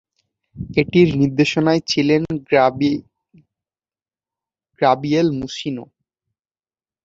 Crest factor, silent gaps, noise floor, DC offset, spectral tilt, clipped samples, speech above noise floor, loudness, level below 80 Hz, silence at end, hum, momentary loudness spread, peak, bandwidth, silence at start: 18 dB; none; under -90 dBFS; under 0.1%; -6 dB/octave; under 0.1%; over 73 dB; -18 LUFS; -50 dBFS; 1.2 s; none; 12 LU; -2 dBFS; 7.8 kHz; 0.55 s